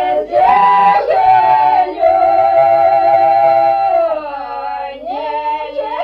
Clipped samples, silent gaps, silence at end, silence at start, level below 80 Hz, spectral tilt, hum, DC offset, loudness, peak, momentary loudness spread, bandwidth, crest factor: under 0.1%; none; 0 s; 0 s; -48 dBFS; -6 dB/octave; none; under 0.1%; -12 LUFS; -2 dBFS; 13 LU; 5.6 kHz; 10 dB